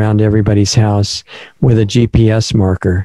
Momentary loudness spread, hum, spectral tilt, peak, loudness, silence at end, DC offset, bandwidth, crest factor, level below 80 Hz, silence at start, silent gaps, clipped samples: 5 LU; none; -6 dB/octave; 0 dBFS; -12 LUFS; 0 s; under 0.1%; 11 kHz; 10 dB; -30 dBFS; 0 s; none; under 0.1%